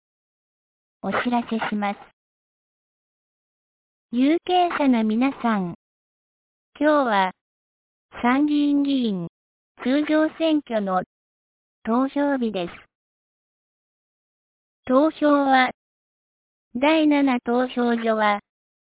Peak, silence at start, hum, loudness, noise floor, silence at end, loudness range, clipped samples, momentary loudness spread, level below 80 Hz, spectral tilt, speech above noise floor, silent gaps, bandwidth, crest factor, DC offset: -6 dBFS; 1.05 s; none; -22 LUFS; under -90 dBFS; 0.5 s; 7 LU; under 0.1%; 11 LU; -64 dBFS; -9.5 dB/octave; over 69 dB; 2.13-4.09 s, 5.75-6.72 s, 7.41-8.09 s, 9.29-9.75 s, 11.06-11.82 s, 12.95-14.83 s, 15.74-16.71 s; 4 kHz; 18 dB; under 0.1%